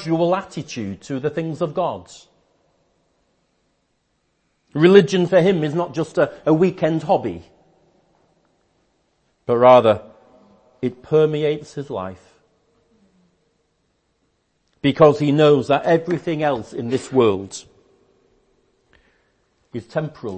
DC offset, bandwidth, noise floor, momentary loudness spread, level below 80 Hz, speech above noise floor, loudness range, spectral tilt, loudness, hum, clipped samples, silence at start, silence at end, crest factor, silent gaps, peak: under 0.1%; 8.8 kHz; -68 dBFS; 16 LU; -60 dBFS; 50 dB; 11 LU; -7 dB/octave; -18 LUFS; none; under 0.1%; 0 s; 0 s; 20 dB; none; 0 dBFS